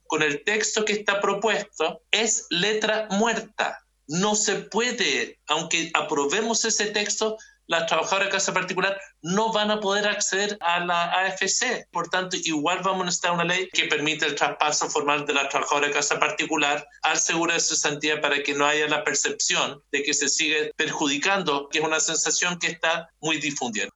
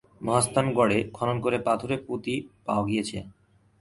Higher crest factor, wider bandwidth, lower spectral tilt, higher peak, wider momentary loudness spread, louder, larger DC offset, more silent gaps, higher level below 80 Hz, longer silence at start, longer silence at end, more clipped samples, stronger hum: about the same, 24 dB vs 20 dB; second, 8.6 kHz vs 11.5 kHz; second, -1.5 dB/octave vs -5 dB/octave; first, 0 dBFS vs -8 dBFS; second, 5 LU vs 9 LU; first, -23 LUFS vs -26 LUFS; neither; neither; second, -68 dBFS vs -56 dBFS; about the same, 0.1 s vs 0.2 s; second, 0.05 s vs 0.5 s; neither; neither